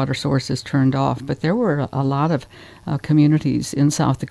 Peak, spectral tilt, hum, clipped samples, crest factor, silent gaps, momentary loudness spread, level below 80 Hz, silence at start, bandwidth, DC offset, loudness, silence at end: -4 dBFS; -6.5 dB/octave; none; under 0.1%; 14 dB; none; 7 LU; -48 dBFS; 0 s; 11 kHz; under 0.1%; -20 LUFS; 0 s